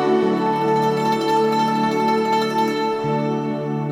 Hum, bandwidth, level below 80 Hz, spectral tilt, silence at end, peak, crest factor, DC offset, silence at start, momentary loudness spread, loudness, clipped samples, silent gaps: none; 16 kHz; -60 dBFS; -6 dB/octave; 0 s; -8 dBFS; 12 dB; under 0.1%; 0 s; 4 LU; -19 LUFS; under 0.1%; none